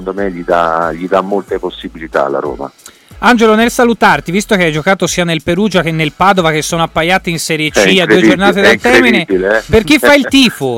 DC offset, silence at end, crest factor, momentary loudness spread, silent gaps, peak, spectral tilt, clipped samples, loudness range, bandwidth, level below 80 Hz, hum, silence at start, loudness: under 0.1%; 0 s; 10 dB; 10 LU; none; 0 dBFS; -4.5 dB/octave; under 0.1%; 5 LU; 17 kHz; -36 dBFS; none; 0 s; -10 LUFS